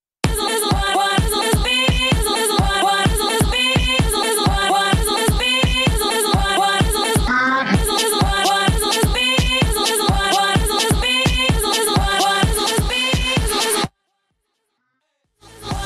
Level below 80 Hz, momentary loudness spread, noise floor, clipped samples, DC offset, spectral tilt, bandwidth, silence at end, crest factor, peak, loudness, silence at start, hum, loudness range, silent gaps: -26 dBFS; 2 LU; -71 dBFS; under 0.1%; under 0.1%; -3.5 dB/octave; 14 kHz; 0 s; 16 dB; -2 dBFS; -16 LUFS; 0.25 s; none; 2 LU; none